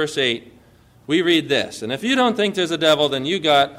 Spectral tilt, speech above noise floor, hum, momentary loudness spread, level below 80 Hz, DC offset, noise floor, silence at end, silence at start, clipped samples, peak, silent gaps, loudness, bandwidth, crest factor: -4 dB/octave; 32 dB; none; 6 LU; -60 dBFS; under 0.1%; -51 dBFS; 0 s; 0 s; under 0.1%; -6 dBFS; none; -19 LUFS; 16 kHz; 14 dB